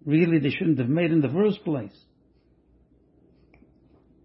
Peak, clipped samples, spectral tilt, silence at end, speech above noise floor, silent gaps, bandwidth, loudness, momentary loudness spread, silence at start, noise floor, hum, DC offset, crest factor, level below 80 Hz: -10 dBFS; under 0.1%; -12 dB/octave; 2.35 s; 39 dB; none; 5.8 kHz; -23 LUFS; 10 LU; 0.05 s; -62 dBFS; none; under 0.1%; 16 dB; -64 dBFS